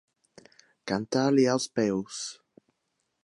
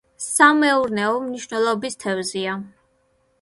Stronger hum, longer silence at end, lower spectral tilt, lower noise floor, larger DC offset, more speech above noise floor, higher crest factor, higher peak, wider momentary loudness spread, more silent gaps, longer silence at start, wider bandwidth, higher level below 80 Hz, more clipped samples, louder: neither; first, 0.9 s vs 0.75 s; first, -5 dB/octave vs -3 dB/octave; first, -79 dBFS vs -64 dBFS; neither; first, 52 dB vs 44 dB; about the same, 18 dB vs 20 dB; second, -12 dBFS vs -2 dBFS; about the same, 14 LU vs 13 LU; neither; first, 0.85 s vs 0.2 s; about the same, 11.5 kHz vs 12 kHz; about the same, -68 dBFS vs -64 dBFS; neither; second, -27 LUFS vs -20 LUFS